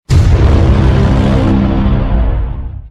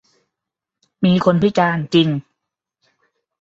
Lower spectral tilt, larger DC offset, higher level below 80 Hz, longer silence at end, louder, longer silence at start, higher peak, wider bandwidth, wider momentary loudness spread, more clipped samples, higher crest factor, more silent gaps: about the same, -8 dB/octave vs -7 dB/octave; neither; first, -12 dBFS vs -54 dBFS; second, 0 s vs 1.2 s; first, -11 LUFS vs -17 LUFS; second, 0.1 s vs 1 s; about the same, 0 dBFS vs -2 dBFS; first, 9.4 kHz vs 7.6 kHz; about the same, 8 LU vs 6 LU; neither; second, 10 dB vs 18 dB; neither